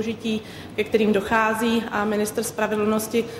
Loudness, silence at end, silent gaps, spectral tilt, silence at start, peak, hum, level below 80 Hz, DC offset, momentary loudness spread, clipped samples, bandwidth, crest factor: -23 LUFS; 0 s; none; -4.5 dB/octave; 0 s; -6 dBFS; none; -54 dBFS; under 0.1%; 8 LU; under 0.1%; 16 kHz; 16 dB